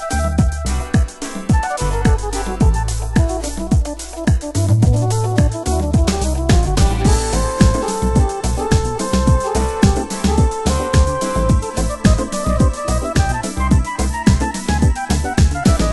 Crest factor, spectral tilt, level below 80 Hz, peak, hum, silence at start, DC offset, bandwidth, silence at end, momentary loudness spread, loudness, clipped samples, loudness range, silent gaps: 16 dB; -6 dB/octave; -20 dBFS; 0 dBFS; none; 0 s; under 0.1%; 12 kHz; 0 s; 5 LU; -17 LUFS; under 0.1%; 2 LU; none